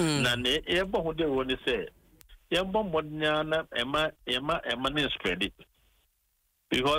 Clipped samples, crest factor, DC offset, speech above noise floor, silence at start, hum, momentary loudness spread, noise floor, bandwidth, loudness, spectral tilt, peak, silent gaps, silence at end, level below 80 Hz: under 0.1%; 14 dB; under 0.1%; 45 dB; 0 s; none; 5 LU; -74 dBFS; 16 kHz; -29 LUFS; -4 dB/octave; -16 dBFS; none; 0 s; -50 dBFS